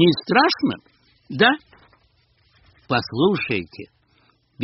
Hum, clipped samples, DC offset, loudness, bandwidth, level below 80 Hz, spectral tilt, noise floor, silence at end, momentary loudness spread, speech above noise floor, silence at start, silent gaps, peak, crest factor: none; under 0.1%; under 0.1%; -20 LUFS; 6 kHz; -58 dBFS; -3 dB/octave; -61 dBFS; 0 s; 18 LU; 42 dB; 0 s; none; 0 dBFS; 22 dB